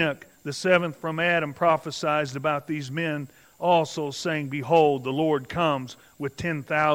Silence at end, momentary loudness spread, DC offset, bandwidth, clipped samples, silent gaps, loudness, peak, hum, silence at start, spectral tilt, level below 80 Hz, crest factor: 0 s; 10 LU; under 0.1%; 16 kHz; under 0.1%; none; -25 LUFS; -6 dBFS; none; 0 s; -5.5 dB/octave; -62 dBFS; 20 dB